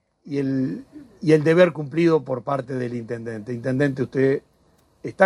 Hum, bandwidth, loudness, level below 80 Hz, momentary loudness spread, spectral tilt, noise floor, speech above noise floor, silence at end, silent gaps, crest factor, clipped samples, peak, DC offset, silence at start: none; 11 kHz; -22 LUFS; -62 dBFS; 14 LU; -8 dB/octave; -60 dBFS; 39 dB; 0 s; none; 20 dB; under 0.1%; -2 dBFS; under 0.1%; 0.25 s